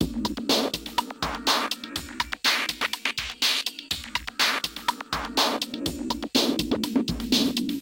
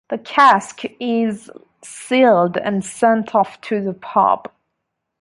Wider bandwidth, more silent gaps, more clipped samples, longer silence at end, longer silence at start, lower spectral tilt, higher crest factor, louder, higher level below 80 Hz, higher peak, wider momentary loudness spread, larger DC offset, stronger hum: first, 17 kHz vs 11.5 kHz; neither; neither; second, 0 s vs 0.8 s; about the same, 0 s vs 0.1 s; second, -2.5 dB/octave vs -5 dB/octave; about the same, 18 dB vs 16 dB; second, -26 LUFS vs -17 LUFS; first, -46 dBFS vs -64 dBFS; second, -8 dBFS vs -2 dBFS; second, 8 LU vs 13 LU; neither; neither